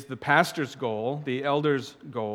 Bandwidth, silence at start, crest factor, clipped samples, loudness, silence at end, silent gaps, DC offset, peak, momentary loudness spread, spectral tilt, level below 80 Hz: 17 kHz; 0 s; 22 dB; under 0.1%; -26 LUFS; 0 s; none; under 0.1%; -4 dBFS; 9 LU; -5.5 dB/octave; -72 dBFS